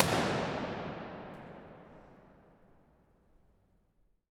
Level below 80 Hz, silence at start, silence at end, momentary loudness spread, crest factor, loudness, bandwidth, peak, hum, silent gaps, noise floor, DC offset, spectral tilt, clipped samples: -62 dBFS; 0 s; 2.05 s; 25 LU; 32 dB; -36 LUFS; 17.5 kHz; -6 dBFS; none; none; -71 dBFS; under 0.1%; -4.5 dB/octave; under 0.1%